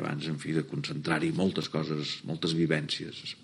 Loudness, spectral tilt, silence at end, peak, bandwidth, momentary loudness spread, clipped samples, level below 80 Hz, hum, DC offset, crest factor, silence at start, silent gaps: -31 LUFS; -5.5 dB/octave; 0 s; -12 dBFS; 11.5 kHz; 6 LU; under 0.1%; -66 dBFS; none; under 0.1%; 20 dB; 0 s; none